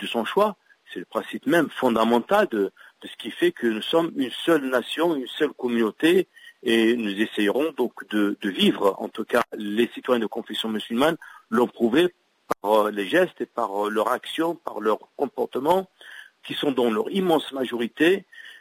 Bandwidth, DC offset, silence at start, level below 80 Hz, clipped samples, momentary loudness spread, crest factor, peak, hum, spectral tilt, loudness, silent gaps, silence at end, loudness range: 16 kHz; under 0.1%; 0 s; -68 dBFS; under 0.1%; 10 LU; 16 dB; -8 dBFS; none; -5 dB/octave; -24 LUFS; none; 0.05 s; 2 LU